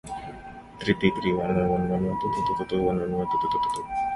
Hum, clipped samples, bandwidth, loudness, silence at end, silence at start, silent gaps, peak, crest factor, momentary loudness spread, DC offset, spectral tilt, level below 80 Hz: none; under 0.1%; 11.5 kHz; -26 LUFS; 0 s; 0.05 s; none; -6 dBFS; 20 dB; 13 LU; under 0.1%; -7 dB/octave; -48 dBFS